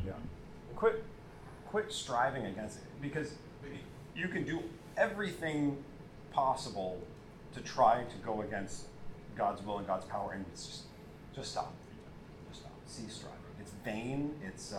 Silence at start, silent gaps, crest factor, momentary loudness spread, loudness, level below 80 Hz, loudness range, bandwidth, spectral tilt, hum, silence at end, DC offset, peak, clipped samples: 0 s; none; 24 dB; 18 LU; -37 LUFS; -58 dBFS; 9 LU; 16 kHz; -5 dB/octave; none; 0 s; under 0.1%; -14 dBFS; under 0.1%